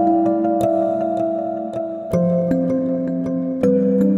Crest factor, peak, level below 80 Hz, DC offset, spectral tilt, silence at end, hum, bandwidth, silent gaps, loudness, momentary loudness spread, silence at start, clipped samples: 14 dB; -4 dBFS; -50 dBFS; under 0.1%; -10 dB/octave; 0 s; none; 15 kHz; none; -19 LUFS; 7 LU; 0 s; under 0.1%